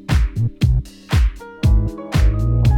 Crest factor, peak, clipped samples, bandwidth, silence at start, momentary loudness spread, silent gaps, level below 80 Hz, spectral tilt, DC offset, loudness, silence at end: 12 dB; -4 dBFS; under 0.1%; 13 kHz; 0.1 s; 4 LU; none; -18 dBFS; -7 dB/octave; under 0.1%; -19 LUFS; 0 s